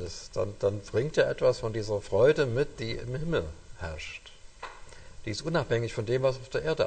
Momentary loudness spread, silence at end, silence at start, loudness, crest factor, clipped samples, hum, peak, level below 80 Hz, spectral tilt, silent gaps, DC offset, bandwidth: 18 LU; 0 s; 0 s; -29 LUFS; 18 dB; under 0.1%; none; -10 dBFS; -48 dBFS; -6 dB/octave; none; under 0.1%; 9.2 kHz